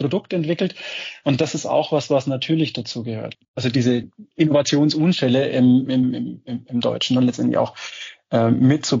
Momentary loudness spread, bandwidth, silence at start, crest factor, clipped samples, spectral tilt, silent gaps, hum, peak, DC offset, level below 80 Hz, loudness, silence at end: 13 LU; 7.6 kHz; 0 s; 14 dB; under 0.1%; -5.5 dB/octave; 3.48-3.54 s; none; -6 dBFS; under 0.1%; -64 dBFS; -20 LUFS; 0 s